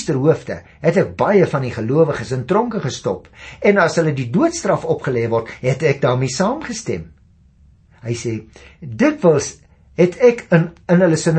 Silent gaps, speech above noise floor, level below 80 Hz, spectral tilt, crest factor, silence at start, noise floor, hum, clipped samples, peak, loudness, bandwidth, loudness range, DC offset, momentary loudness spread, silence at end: none; 33 dB; -50 dBFS; -6 dB/octave; 16 dB; 0 s; -50 dBFS; none; under 0.1%; -2 dBFS; -17 LUFS; 8.8 kHz; 4 LU; under 0.1%; 13 LU; 0 s